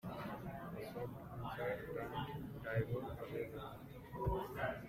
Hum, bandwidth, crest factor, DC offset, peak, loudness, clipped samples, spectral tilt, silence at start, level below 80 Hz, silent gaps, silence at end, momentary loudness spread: none; 16 kHz; 18 dB; under 0.1%; -26 dBFS; -45 LUFS; under 0.1%; -7.5 dB/octave; 0.05 s; -58 dBFS; none; 0 s; 7 LU